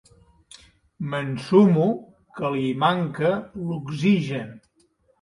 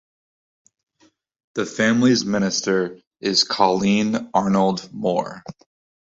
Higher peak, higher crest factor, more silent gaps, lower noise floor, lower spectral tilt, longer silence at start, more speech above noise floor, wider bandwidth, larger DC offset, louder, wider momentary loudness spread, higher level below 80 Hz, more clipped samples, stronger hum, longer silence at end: about the same, -4 dBFS vs -2 dBFS; about the same, 20 dB vs 20 dB; second, none vs 3.07-3.11 s; about the same, -64 dBFS vs -61 dBFS; first, -7.5 dB/octave vs -4.5 dB/octave; second, 1 s vs 1.55 s; about the same, 42 dB vs 41 dB; first, 11 kHz vs 8 kHz; neither; second, -23 LUFS vs -20 LUFS; first, 15 LU vs 12 LU; about the same, -62 dBFS vs -58 dBFS; neither; neither; about the same, 0.65 s vs 0.55 s